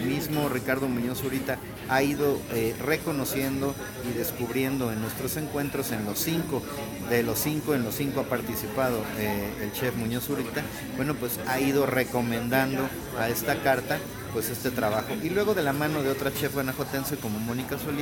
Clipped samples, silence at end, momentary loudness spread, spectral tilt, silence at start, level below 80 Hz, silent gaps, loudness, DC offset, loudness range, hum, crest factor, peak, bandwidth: under 0.1%; 0 s; 6 LU; -5 dB/octave; 0 s; -50 dBFS; none; -28 LUFS; under 0.1%; 3 LU; none; 20 dB; -8 dBFS; 19 kHz